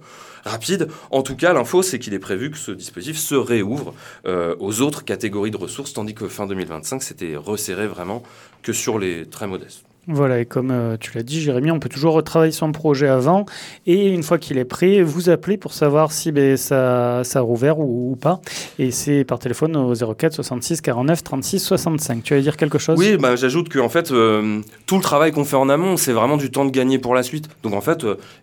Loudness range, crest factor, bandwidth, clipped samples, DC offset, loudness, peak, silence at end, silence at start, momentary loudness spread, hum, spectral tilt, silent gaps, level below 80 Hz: 7 LU; 18 dB; 19 kHz; under 0.1%; under 0.1%; -19 LUFS; -2 dBFS; 0.1 s; 0.1 s; 12 LU; none; -5 dB/octave; none; -56 dBFS